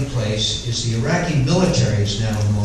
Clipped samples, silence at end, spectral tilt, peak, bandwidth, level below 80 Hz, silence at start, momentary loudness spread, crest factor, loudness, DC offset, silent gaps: under 0.1%; 0 s; -5 dB/octave; -4 dBFS; 12 kHz; -34 dBFS; 0 s; 5 LU; 14 dB; -19 LUFS; under 0.1%; none